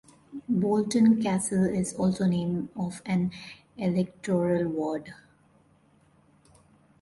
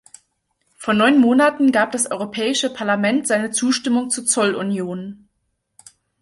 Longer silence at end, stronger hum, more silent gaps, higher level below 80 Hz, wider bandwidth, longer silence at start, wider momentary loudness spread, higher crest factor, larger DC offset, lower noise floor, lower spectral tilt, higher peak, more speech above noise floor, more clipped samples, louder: first, 1.9 s vs 1.05 s; neither; neither; about the same, -62 dBFS vs -64 dBFS; about the same, 11.5 kHz vs 11.5 kHz; second, 0.3 s vs 0.8 s; first, 14 LU vs 10 LU; about the same, 16 dB vs 16 dB; neither; second, -62 dBFS vs -72 dBFS; first, -6.5 dB/octave vs -3.5 dB/octave; second, -12 dBFS vs -2 dBFS; second, 36 dB vs 54 dB; neither; second, -27 LUFS vs -18 LUFS